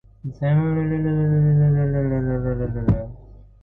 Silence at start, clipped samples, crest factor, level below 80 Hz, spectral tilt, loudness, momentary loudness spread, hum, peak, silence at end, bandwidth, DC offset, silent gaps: 0.25 s; under 0.1%; 14 dB; -36 dBFS; -12.5 dB/octave; -21 LUFS; 8 LU; none; -8 dBFS; 0.25 s; 3.7 kHz; under 0.1%; none